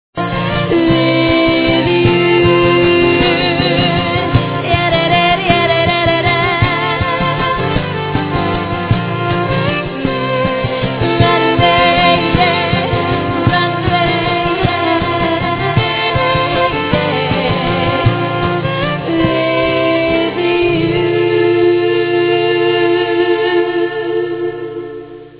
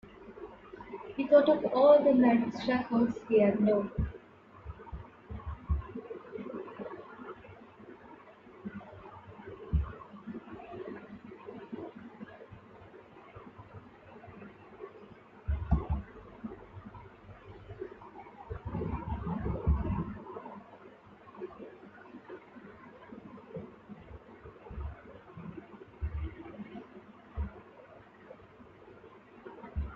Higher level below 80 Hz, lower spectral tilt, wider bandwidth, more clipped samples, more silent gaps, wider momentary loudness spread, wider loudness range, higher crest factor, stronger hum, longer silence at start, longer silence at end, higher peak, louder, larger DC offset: first, -32 dBFS vs -46 dBFS; about the same, -10 dB/octave vs -9.5 dB/octave; second, 4 kHz vs 6.8 kHz; neither; neither; second, 6 LU vs 26 LU; second, 4 LU vs 22 LU; second, 14 dB vs 24 dB; neither; about the same, 0.15 s vs 0.05 s; about the same, 0 s vs 0 s; first, 0 dBFS vs -10 dBFS; first, -13 LUFS vs -31 LUFS; first, 0.2% vs under 0.1%